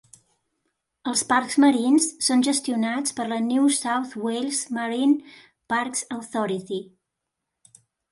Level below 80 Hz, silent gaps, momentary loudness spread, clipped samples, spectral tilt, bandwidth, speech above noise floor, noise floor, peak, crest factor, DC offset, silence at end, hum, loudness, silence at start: -72 dBFS; none; 9 LU; under 0.1%; -2.5 dB/octave; 11.5 kHz; 60 dB; -82 dBFS; -6 dBFS; 18 dB; under 0.1%; 1.3 s; none; -23 LUFS; 1.05 s